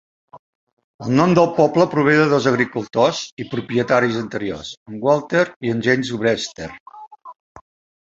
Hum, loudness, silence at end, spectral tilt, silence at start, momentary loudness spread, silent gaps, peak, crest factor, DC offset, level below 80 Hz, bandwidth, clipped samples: none; -18 LUFS; 0.55 s; -6 dB/octave; 0.35 s; 14 LU; 0.39-0.77 s, 0.84-0.99 s, 3.32-3.37 s, 4.77-4.86 s, 5.56-5.61 s, 6.80-6.86 s, 7.07-7.11 s, 7.40-7.55 s; -2 dBFS; 18 dB; under 0.1%; -56 dBFS; 8 kHz; under 0.1%